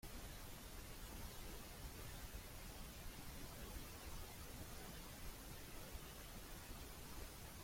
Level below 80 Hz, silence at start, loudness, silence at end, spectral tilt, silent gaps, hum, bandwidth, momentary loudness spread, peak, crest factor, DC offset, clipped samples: -58 dBFS; 0.05 s; -54 LUFS; 0 s; -3.5 dB/octave; none; none; 16.5 kHz; 1 LU; -38 dBFS; 16 dB; under 0.1%; under 0.1%